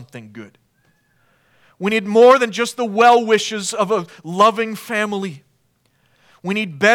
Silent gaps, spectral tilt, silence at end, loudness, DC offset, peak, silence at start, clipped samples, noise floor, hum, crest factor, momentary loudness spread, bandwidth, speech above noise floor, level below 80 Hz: none; -4 dB/octave; 0 s; -16 LUFS; under 0.1%; 0 dBFS; 0 s; under 0.1%; -63 dBFS; none; 18 dB; 18 LU; 16.5 kHz; 46 dB; -70 dBFS